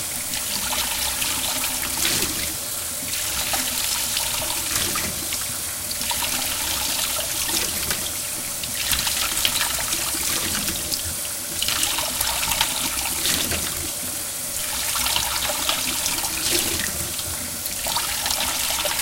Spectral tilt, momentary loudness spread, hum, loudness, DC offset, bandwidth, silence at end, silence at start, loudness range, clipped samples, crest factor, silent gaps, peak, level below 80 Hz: -0.5 dB/octave; 5 LU; none; -22 LUFS; under 0.1%; 17 kHz; 0 s; 0 s; 1 LU; under 0.1%; 24 dB; none; -2 dBFS; -44 dBFS